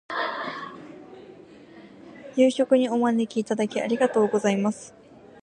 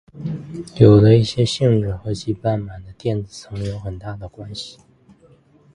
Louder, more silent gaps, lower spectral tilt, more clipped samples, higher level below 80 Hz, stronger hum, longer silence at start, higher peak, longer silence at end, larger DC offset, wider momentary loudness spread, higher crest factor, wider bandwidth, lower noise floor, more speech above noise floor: second, -24 LUFS vs -18 LUFS; neither; second, -5.5 dB/octave vs -7.5 dB/octave; neither; second, -72 dBFS vs -42 dBFS; neither; about the same, 0.1 s vs 0.15 s; second, -6 dBFS vs 0 dBFS; second, 0.55 s vs 1.05 s; neither; first, 23 LU vs 20 LU; about the same, 18 dB vs 20 dB; about the same, 11 kHz vs 10.5 kHz; second, -47 dBFS vs -52 dBFS; second, 25 dB vs 34 dB